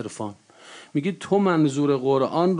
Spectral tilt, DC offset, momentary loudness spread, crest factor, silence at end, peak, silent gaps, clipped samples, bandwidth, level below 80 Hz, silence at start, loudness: -7 dB/octave; under 0.1%; 13 LU; 14 dB; 0 s; -8 dBFS; none; under 0.1%; 10.5 kHz; -70 dBFS; 0 s; -22 LUFS